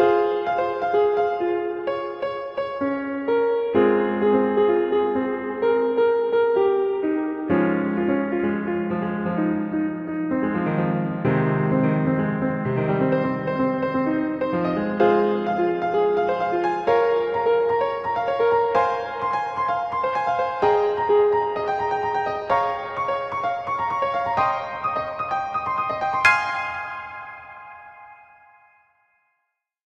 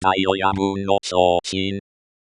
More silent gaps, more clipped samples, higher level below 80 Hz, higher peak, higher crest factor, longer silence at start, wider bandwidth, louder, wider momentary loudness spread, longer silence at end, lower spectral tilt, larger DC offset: neither; neither; about the same, -58 dBFS vs -54 dBFS; about the same, -2 dBFS vs -2 dBFS; about the same, 20 dB vs 18 dB; about the same, 0 s vs 0 s; second, 8.6 kHz vs 11 kHz; about the same, -22 LUFS vs -20 LUFS; about the same, 7 LU vs 7 LU; first, 1.85 s vs 0.5 s; first, -7.5 dB/octave vs -4.5 dB/octave; neither